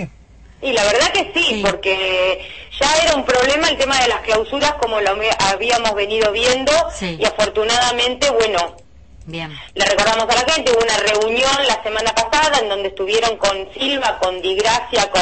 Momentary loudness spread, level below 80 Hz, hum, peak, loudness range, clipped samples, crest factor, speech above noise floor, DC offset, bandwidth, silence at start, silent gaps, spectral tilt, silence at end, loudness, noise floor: 6 LU; -40 dBFS; none; -2 dBFS; 2 LU; under 0.1%; 16 dB; 27 dB; 0.4%; 8.8 kHz; 0 s; none; -2 dB/octave; 0 s; -16 LUFS; -43 dBFS